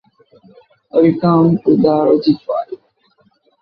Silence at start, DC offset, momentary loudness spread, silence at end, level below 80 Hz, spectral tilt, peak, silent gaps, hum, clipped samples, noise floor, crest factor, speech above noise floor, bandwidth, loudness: 0.95 s; under 0.1%; 10 LU; 0.85 s; -56 dBFS; -11 dB/octave; -2 dBFS; none; none; under 0.1%; -57 dBFS; 14 dB; 45 dB; 5.4 kHz; -14 LUFS